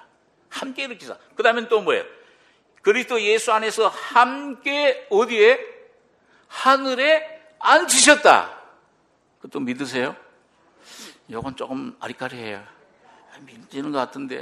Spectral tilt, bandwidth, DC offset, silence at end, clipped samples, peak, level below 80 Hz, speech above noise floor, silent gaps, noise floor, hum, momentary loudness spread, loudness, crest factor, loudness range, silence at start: -1.5 dB/octave; 14 kHz; under 0.1%; 0 s; under 0.1%; 0 dBFS; -66 dBFS; 42 dB; none; -62 dBFS; none; 21 LU; -19 LUFS; 22 dB; 14 LU; 0.5 s